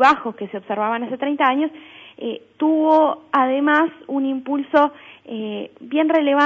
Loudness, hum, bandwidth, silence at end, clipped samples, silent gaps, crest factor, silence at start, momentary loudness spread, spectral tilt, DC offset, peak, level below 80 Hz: -20 LUFS; none; 7.6 kHz; 0 s; under 0.1%; none; 16 dB; 0 s; 14 LU; -5.5 dB/octave; under 0.1%; -2 dBFS; -66 dBFS